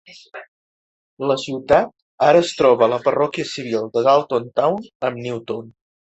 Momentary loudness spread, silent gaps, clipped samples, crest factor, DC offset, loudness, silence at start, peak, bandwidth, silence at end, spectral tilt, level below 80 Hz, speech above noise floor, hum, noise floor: 15 LU; 0.48-1.17 s, 2.02-2.18 s, 4.95-5.00 s; under 0.1%; 18 dB; under 0.1%; -19 LUFS; 0.1 s; -2 dBFS; 8.2 kHz; 0.35 s; -5 dB/octave; -54 dBFS; over 72 dB; none; under -90 dBFS